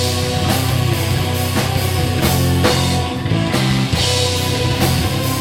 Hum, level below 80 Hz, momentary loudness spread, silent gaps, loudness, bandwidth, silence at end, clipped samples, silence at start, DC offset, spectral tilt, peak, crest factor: none; -32 dBFS; 3 LU; none; -16 LUFS; 17 kHz; 0 s; under 0.1%; 0 s; under 0.1%; -4.5 dB/octave; 0 dBFS; 16 dB